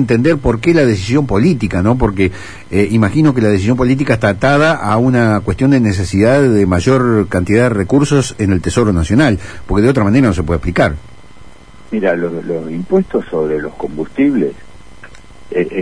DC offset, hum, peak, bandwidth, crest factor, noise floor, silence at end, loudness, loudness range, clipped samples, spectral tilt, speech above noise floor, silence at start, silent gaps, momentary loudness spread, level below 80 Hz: 2%; none; 0 dBFS; 10.5 kHz; 12 dB; -39 dBFS; 0 s; -13 LUFS; 6 LU; under 0.1%; -7 dB/octave; 27 dB; 0 s; none; 8 LU; -32 dBFS